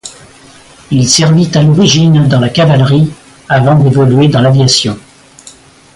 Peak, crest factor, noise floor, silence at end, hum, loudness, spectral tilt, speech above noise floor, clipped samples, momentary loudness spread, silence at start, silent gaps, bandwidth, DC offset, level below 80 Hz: 0 dBFS; 8 dB; -37 dBFS; 0.95 s; none; -8 LUFS; -5.5 dB/octave; 30 dB; under 0.1%; 8 LU; 0.05 s; none; 11.5 kHz; under 0.1%; -40 dBFS